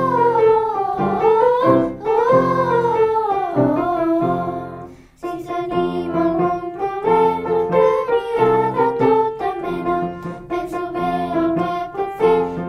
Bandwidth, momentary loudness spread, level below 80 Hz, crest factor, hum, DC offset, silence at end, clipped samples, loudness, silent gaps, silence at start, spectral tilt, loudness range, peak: 10.5 kHz; 10 LU; -48 dBFS; 16 dB; none; under 0.1%; 0 s; under 0.1%; -18 LUFS; none; 0 s; -8 dB/octave; 5 LU; -2 dBFS